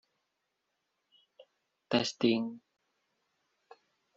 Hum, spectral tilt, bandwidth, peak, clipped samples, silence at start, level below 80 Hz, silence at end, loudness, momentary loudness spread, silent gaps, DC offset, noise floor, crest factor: none; -3.5 dB/octave; 7.8 kHz; -14 dBFS; under 0.1%; 1.4 s; -76 dBFS; 1.6 s; -31 LUFS; 13 LU; none; under 0.1%; -83 dBFS; 24 dB